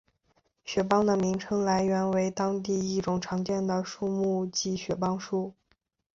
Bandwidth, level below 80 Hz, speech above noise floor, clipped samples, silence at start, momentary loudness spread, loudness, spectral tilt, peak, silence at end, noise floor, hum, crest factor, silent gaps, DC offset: 7.6 kHz; -60 dBFS; 45 dB; under 0.1%; 0.65 s; 6 LU; -29 LUFS; -5.5 dB/octave; -10 dBFS; 0.65 s; -73 dBFS; none; 18 dB; none; under 0.1%